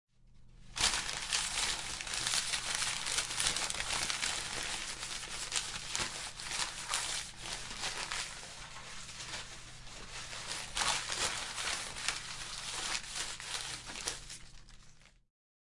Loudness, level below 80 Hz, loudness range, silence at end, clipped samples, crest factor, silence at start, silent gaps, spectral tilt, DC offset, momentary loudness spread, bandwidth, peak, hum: -36 LUFS; -56 dBFS; 7 LU; 0.7 s; under 0.1%; 28 dB; 0.2 s; none; 0 dB/octave; under 0.1%; 14 LU; 12 kHz; -12 dBFS; none